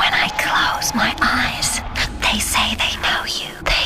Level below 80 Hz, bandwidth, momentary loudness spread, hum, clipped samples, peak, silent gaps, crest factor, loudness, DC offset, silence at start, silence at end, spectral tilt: -32 dBFS; 15.5 kHz; 4 LU; none; under 0.1%; -4 dBFS; none; 14 dB; -18 LUFS; 0.5%; 0 s; 0 s; -1.5 dB/octave